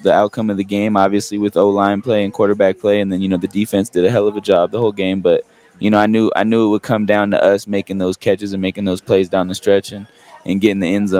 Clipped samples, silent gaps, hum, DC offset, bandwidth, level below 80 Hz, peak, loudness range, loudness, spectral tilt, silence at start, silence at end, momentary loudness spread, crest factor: under 0.1%; none; none; under 0.1%; 16 kHz; -58 dBFS; 0 dBFS; 2 LU; -16 LUFS; -6.5 dB/octave; 0 s; 0 s; 6 LU; 16 dB